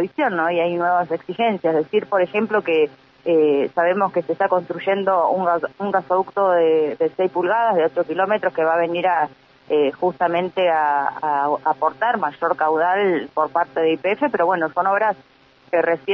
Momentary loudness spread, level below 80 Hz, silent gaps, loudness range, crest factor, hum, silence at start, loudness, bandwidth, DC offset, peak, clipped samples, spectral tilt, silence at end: 4 LU; -70 dBFS; none; 1 LU; 16 dB; none; 0 s; -20 LUFS; 5.8 kHz; under 0.1%; -4 dBFS; under 0.1%; -8 dB/octave; 0 s